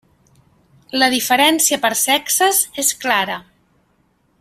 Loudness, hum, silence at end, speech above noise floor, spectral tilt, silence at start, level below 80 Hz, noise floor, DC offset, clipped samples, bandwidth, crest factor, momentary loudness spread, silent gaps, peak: -15 LUFS; none; 1 s; 44 dB; -0.5 dB/octave; 0.95 s; -62 dBFS; -61 dBFS; under 0.1%; under 0.1%; 16 kHz; 18 dB; 7 LU; none; 0 dBFS